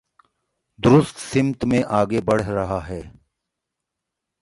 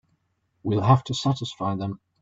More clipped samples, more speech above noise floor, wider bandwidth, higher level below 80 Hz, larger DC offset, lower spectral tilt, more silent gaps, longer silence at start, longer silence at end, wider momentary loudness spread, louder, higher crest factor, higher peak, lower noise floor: neither; first, 63 dB vs 48 dB; first, 11.5 kHz vs 7.8 kHz; first, -46 dBFS vs -56 dBFS; neither; about the same, -7 dB/octave vs -6.5 dB/octave; neither; first, 0.8 s vs 0.65 s; first, 1.35 s vs 0.25 s; about the same, 11 LU vs 12 LU; first, -20 LUFS vs -24 LUFS; about the same, 20 dB vs 22 dB; about the same, -2 dBFS vs -4 dBFS; first, -82 dBFS vs -71 dBFS